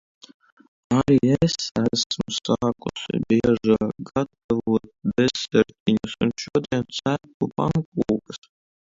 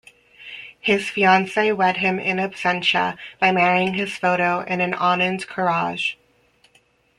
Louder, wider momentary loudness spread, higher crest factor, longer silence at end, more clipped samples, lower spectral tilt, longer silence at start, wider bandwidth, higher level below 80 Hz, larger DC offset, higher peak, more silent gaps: second, -23 LUFS vs -20 LUFS; about the same, 8 LU vs 9 LU; about the same, 18 dB vs 20 dB; second, 0.55 s vs 1.05 s; neither; about the same, -5.5 dB/octave vs -5 dB/octave; first, 0.9 s vs 0.4 s; second, 7.8 kHz vs 11.5 kHz; first, -50 dBFS vs -62 dBFS; neither; about the same, -4 dBFS vs -2 dBFS; first, 1.71-1.75 s, 2.06-2.10 s, 4.44-4.49 s, 5.80-5.86 s, 7.34-7.40 s, 7.85-7.92 s vs none